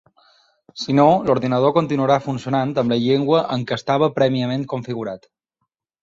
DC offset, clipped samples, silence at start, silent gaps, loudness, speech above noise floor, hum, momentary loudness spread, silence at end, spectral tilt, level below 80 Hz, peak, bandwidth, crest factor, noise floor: under 0.1%; under 0.1%; 0.75 s; none; -19 LUFS; 58 dB; none; 12 LU; 0.85 s; -7 dB/octave; -58 dBFS; -2 dBFS; 7.8 kHz; 18 dB; -77 dBFS